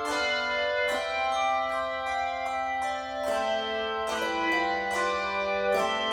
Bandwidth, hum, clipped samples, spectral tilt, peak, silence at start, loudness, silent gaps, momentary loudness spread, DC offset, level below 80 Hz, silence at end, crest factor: 18.5 kHz; none; under 0.1%; -2.5 dB/octave; -14 dBFS; 0 s; -28 LUFS; none; 4 LU; under 0.1%; -56 dBFS; 0 s; 14 dB